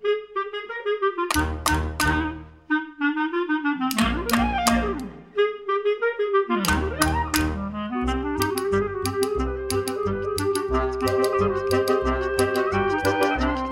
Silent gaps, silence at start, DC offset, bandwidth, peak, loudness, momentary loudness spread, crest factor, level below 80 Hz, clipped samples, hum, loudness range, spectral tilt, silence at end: none; 0 s; under 0.1%; 16.5 kHz; -2 dBFS; -24 LUFS; 5 LU; 22 dB; -36 dBFS; under 0.1%; none; 2 LU; -4.5 dB/octave; 0 s